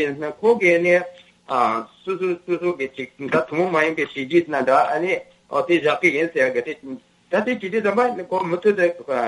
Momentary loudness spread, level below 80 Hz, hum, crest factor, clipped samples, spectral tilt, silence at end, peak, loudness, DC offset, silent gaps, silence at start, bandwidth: 10 LU; -68 dBFS; none; 16 dB; under 0.1%; -6 dB/octave; 0 s; -4 dBFS; -20 LUFS; under 0.1%; none; 0 s; 11 kHz